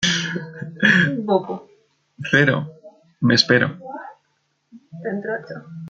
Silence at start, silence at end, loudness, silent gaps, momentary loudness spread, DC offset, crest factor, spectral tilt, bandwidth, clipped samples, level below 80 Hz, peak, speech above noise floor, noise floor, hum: 0 s; 0 s; -19 LUFS; none; 19 LU; under 0.1%; 22 dB; -4.5 dB/octave; 8.8 kHz; under 0.1%; -60 dBFS; 0 dBFS; 49 dB; -69 dBFS; none